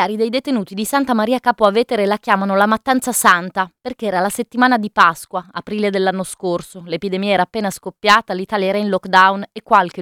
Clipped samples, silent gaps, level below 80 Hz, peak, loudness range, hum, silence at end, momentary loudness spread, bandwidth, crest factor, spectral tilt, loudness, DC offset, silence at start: under 0.1%; none; -56 dBFS; 0 dBFS; 3 LU; none; 0 s; 11 LU; 19.5 kHz; 16 dB; -4 dB/octave; -17 LUFS; under 0.1%; 0 s